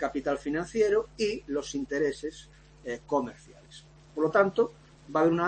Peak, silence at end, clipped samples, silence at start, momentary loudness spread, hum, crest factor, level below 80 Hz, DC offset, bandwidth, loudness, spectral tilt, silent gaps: -12 dBFS; 0 s; under 0.1%; 0 s; 16 LU; none; 18 dB; -56 dBFS; under 0.1%; 8.8 kHz; -29 LUFS; -5.5 dB/octave; none